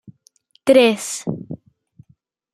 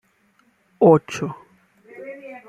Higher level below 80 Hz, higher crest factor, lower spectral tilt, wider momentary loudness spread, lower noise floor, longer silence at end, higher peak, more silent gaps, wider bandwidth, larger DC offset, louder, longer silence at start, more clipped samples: about the same, -62 dBFS vs -66 dBFS; about the same, 18 dB vs 20 dB; second, -4 dB/octave vs -7.5 dB/octave; about the same, 22 LU vs 24 LU; about the same, -59 dBFS vs -62 dBFS; first, 1 s vs 0.1 s; about the same, -2 dBFS vs -2 dBFS; neither; first, 15 kHz vs 10.5 kHz; neither; about the same, -17 LUFS vs -18 LUFS; second, 0.65 s vs 0.8 s; neither